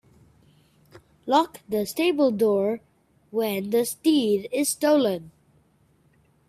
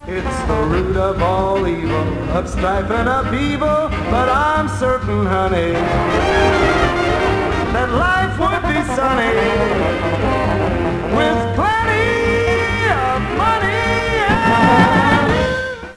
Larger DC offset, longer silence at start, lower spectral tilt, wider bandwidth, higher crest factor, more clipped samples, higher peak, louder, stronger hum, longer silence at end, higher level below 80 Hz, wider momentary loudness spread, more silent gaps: second, under 0.1% vs 0.2%; first, 1.25 s vs 0 s; second, -4 dB/octave vs -6 dB/octave; first, 16 kHz vs 11 kHz; about the same, 18 dB vs 16 dB; neither; second, -8 dBFS vs 0 dBFS; second, -24 LUFS vs -16 LUFS; neither; first, 1.2 s vs 0 s; second, -68 dBFS vs -28 dBFS; first, 8 LU vs 5 LU; neither